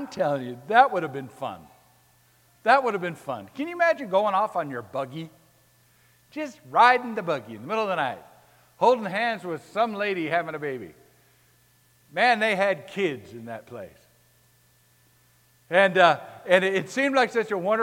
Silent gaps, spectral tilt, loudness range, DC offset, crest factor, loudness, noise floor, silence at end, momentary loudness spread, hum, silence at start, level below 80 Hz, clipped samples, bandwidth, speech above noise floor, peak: none; -5 dB/octave; 4 LU; under 0.1%; 22 dB; -24 LUFS; -61 dBFS; 0 s; 19 LU; none; 0 s; -74 dBFS; under 0.1%; 17 kHz; 37 dB; -4 dBFS